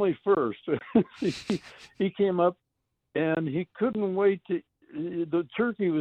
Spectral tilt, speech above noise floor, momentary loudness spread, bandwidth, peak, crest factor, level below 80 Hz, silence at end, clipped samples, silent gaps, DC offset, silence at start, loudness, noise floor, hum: -7.5 dB/octave; 53 dB; 9 LU; 9.6 kHz; -10 dBFS; 18 dB; -66 dBFS; 0 s; under 0.1%; none; under 0.1%; 0 s; -28 LUFS; -80 dBFS; none